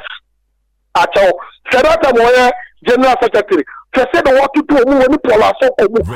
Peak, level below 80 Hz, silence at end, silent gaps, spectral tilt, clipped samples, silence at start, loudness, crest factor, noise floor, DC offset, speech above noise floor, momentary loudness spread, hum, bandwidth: -6 dBFS; -38 dBFS; 0 s; none; -5 dB/octave; under 0.1%; 0 s; -11 LUFS; 6 dB; -63 dBFS; under 0.1%; 52 dB; 7 LU; none; 15.5 kHz